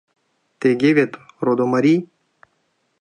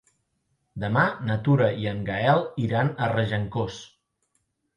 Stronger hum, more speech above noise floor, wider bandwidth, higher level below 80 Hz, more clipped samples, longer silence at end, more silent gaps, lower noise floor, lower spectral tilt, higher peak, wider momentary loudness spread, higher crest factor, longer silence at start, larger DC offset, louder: neither; about the same, 51 dB vs 50 dB; about the same, 9.6 kHz vs 9 kHz; second, -70 dBFS vs -54 dBFS; neither; about the same, 0.95 s vs 0.9 s; neither; second, -68 dBFS vs -74 dBFS; about the same, -7.5 dB/octave vs -7.5 dB/octave; first, -2 dBFS vs -8 dBFS; second, 7 LU vs 10 LU; about the same, 18 dB vs 18 dB; second, 0.6 s vs 0.75 s; neither; first, -18 LUFS vs -25 LUFS